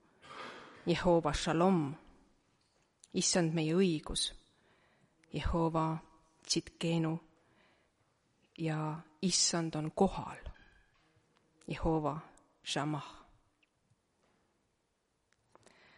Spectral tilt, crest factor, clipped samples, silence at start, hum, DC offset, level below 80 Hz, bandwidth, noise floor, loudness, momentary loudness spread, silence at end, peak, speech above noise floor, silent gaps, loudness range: -4.5 dB/octave; 20 dB; under 0.1%; 0.25 s; none; under 0.1%; -52 dBFS; 11.5 kHz; -80 dBFS; -34 LUFS; 18 LU; 2.75 s; -16 dBFS; 47 dB; none; 7 LU